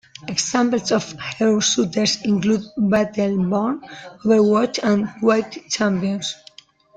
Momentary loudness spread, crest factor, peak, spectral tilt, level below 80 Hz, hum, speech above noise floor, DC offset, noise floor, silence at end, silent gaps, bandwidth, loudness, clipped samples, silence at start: 9 LU; 16 dB; -4 dBFS; -4.5 dB/octave; -58 dBFS; none; 29 dB; under 0.1%; -48 dBFS; 0.6 s; none; 9.2 kHz; -20 LUFS; under 0.1%; 0.25 s